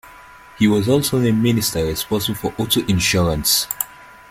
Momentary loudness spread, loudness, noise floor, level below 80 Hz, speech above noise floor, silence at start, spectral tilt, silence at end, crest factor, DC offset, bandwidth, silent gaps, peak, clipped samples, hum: 7 LU; -18 LUFS; -42 dBFS; -40 dBFS; 25 dB; 0.05 s; -4.5 dB/octave; 0.25 s; 18 dB; under 0.1%; 16.5 kHz; none; 0 dBFS; under 0.1%; none